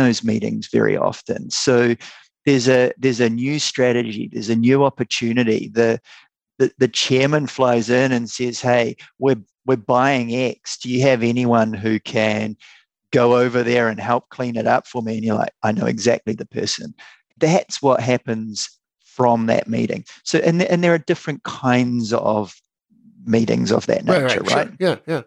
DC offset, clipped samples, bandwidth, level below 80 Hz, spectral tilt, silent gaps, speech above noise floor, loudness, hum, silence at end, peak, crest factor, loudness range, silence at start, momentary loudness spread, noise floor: under 0.1%; under 0.1%; 10.5 kHz; -62 dBFS; -5 dB/octave; none; 36 dB; -19 LUFS; none; 0.05 s; -2 dBFS; 16 dB; 2 LU; 0 s; 8 LU; -54 dBFS